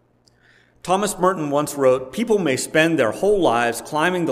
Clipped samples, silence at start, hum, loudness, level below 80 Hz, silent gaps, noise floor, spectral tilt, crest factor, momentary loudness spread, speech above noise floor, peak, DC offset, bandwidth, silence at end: under 0.1%; 0.85 s; none; -19 LUFS; -50 dBFS; none; -57 dBFS; -4.5 dB/octave; 18 dB; 5 LU; 38 dB; -2 dBFS; under 0.1%; 16 kHz; 0 s